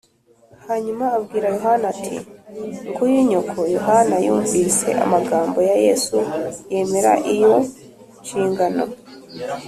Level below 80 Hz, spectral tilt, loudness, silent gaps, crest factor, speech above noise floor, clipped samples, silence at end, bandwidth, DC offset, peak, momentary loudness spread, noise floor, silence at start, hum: -58 dBFS; -4.5 dB/octave; -19 LUFS; none; 16 dB; 36 dB; under 0.1%; 0 s; 14 kHz; under 0.1%; -4 dBFS; 14 LU; -54 dBFS; 0.65 s; none